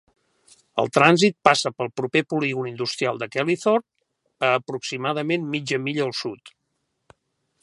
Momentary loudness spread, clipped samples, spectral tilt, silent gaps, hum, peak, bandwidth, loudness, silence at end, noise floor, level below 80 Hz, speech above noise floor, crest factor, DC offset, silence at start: 11 LU; under 0.1%; -4.5 dB/octave; none; none; 0 dBFS; 11.5 kHz; -22 LUFS; 1.15 s; -75 dBFS; -70 dBFS; 53 dB; 24 dB; under 0.1%; 0.75 s